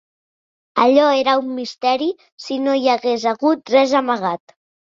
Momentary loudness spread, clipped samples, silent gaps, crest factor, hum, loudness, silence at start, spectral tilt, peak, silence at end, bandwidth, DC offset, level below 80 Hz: 11 LU; under 0.1%; 2.32-2.38 s; 16 dB; none; -17 LUFS; 0.75 s; -4 dB/octave; -2 dBFS; 0.5 s; 7.6 kHz; under 0.1%; -68 dBFS